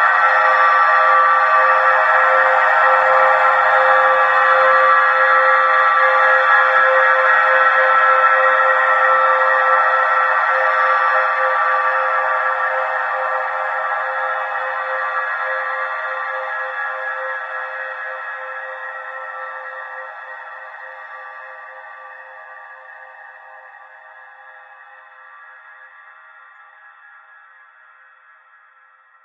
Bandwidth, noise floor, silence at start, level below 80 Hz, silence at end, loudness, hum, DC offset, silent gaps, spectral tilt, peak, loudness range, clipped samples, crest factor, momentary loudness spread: 7.8 kHz; -51 dBFS; 0 s; -78 dBFS; 3.4 s; -14 LUFS; none; under 0.1%; none; -1.5 dB/octave; -2 dBFS; 19 LU; under 0.1%; 16 dB; 19 LU